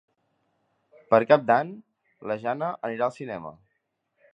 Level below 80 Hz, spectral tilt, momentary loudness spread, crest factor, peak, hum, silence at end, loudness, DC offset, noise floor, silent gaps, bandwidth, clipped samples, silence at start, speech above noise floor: -72 dBFS; -7.5 dB/octave; 18 LU; 24 dB; -4 dBFS; none; 0.8 s; -25 LUFS; under 0.1%; -77 dBFS; none; 8 kHz; under 0.1%; 1.1 s; 53 dB